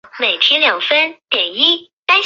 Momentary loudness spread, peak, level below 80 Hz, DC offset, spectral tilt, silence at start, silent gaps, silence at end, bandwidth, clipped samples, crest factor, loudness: 6 LU; 0 dBFS; -72 dBFS; under 0.1%; -1 dB/octave; 0.15 s; 1.93-2.03 s; 0 s; 7.4 kHz; under 0.1%; 16 dB; -13 LUFS